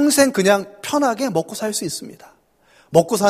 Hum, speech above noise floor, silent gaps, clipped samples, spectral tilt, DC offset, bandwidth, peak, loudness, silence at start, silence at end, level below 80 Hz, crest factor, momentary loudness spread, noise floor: none; 37 dB; none; under 0.1%; -4 dB/octave; under 0.1%; 15.5 kHz; 0 dBFS; -19 LUFS; 0 s; 0 s; -58 dBFS; 18 dB; 12 LU; -55 dBFS